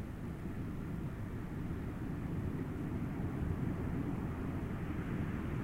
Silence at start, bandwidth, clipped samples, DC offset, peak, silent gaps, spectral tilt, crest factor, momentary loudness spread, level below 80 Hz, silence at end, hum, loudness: 0 s; 16 kHz; under 0.1%; under 0.1%; -24 dBFS; none; -8.5 dB/octave; 14 dB; 4 LU; -48 dBFS; 0 s; none; -40 LUFS